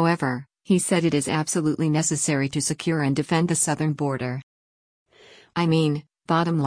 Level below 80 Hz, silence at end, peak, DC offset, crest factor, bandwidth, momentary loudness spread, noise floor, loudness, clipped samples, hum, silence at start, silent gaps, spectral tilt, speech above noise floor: -60 dBFS; 0 s; -8 dBFS; under 0.1%; 14 dB; 10.5 kHz; 8 LU; -52 dBFS; -23 LUFS; under 0.1%; none; 0 s; 4.43-5.06 s; -5 dB/octave; 30 dB